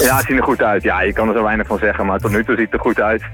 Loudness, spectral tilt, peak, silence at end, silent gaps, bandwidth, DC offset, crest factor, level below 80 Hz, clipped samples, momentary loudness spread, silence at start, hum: -16 LUFS; -5 dB/octave; -2 dBFS; 0 s; none; 19 kHz; under 0.1%; 14 dB; -32 dBFS; under 0.1%; 3 LU; 0 s; none